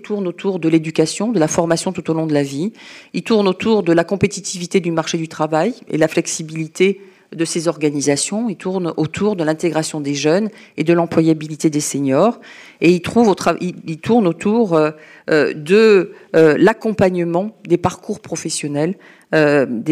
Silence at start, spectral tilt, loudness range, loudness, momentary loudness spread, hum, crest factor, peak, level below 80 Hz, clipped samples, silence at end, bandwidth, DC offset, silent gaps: 0.05 s; -5 dB/octave; 4 LU; -17 LUFS; 9 LU; none; 14 dB; -2 dBFS; -56 dBFS; under 0.1%; 0 s; 14.5 kHz; under 0.1%; none